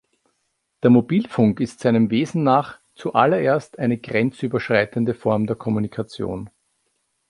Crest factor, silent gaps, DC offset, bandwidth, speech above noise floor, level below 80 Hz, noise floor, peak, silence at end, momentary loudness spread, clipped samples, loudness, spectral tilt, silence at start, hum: 20 dB; none; under 0.1%; 11 kHz; 53 dB; -56 dBFS; -72 dBFS; -2 dBFS; 0.85 s; 11 LU; under 0.1%; -20 LUFS; -7.5 dB/octave; 0.85 s; none